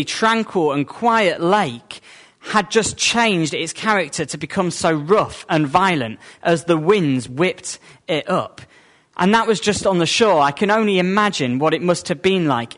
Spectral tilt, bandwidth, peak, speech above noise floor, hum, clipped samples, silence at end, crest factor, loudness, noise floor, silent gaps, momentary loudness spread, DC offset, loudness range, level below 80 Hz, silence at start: -4.5 dB/octave; 11 kHz; -2 dBFS; 26 dB; none; under 0.1%; 0.1 s; 16 dB; -18 LUFS; -44 dBFS; none; 9 LU; under 0.1%; 3 LU; -54 dBFS; 0 s